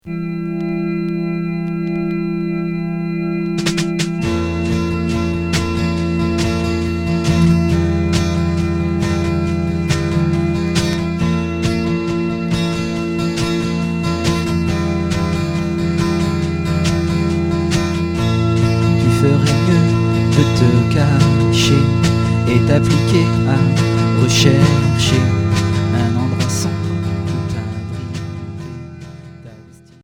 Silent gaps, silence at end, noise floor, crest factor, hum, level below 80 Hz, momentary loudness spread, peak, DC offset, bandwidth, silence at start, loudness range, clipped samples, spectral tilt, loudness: none; 0.4 s; -41 dBFS; 16 dB; none; -32 dBFS; 8 LU; 0 dBFS; under 0.1%; 15.5 kHz; 0.05 s; 6 LU; under 0.1%; -6 dB/octave; -16 LUFS